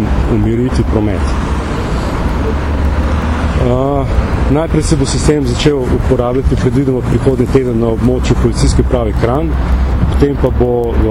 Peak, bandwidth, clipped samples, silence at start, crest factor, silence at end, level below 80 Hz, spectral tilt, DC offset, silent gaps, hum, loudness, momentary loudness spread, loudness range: 0 dBFS; 11.5 kHz; under 0.1%; 0 s; 12 dB; 0 s; -16 dBFS; -7 dB/octave; under 0.1%; none; none; -13 LUFS; 4 LU; 2 LU